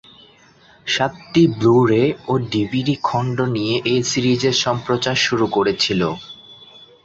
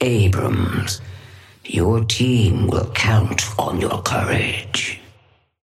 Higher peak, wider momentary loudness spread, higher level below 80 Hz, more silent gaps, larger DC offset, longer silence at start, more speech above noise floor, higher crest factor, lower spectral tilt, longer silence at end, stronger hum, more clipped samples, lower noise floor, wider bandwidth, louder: about the same, -2 dBFS vs -4 dBFS; second, 7 LU vs 10 LU; second, -52 dBFS vs -40 dBFS; neither; neither; first, 0.85 s vs 0 s; second, 32 dB vs 37 dB; about the same, 16 dB vs 16 dB; about the same, -5 dB/octave vs -5 dB/octave; second, 0.4 s vs 0.65 s; neither; neither; second, -50 dBFS vs -55 dBFS; second, 8 kHz vs 15 kHz; about the same, -18 LUFS vs -19 LUFS